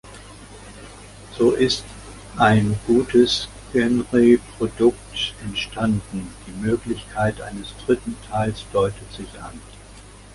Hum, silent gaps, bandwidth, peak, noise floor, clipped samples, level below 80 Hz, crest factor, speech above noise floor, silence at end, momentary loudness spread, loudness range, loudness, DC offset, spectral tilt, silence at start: none; none; 11.5 kHz; -2 dBFS; -43 dBFS; under 0.1%; -42 dBFS; 20 dB; 22 dB; 0.2 s; 23 LU; 7 LU; -21 LUFS; under 0.1%; -5.5 dB/octave; 0.05 s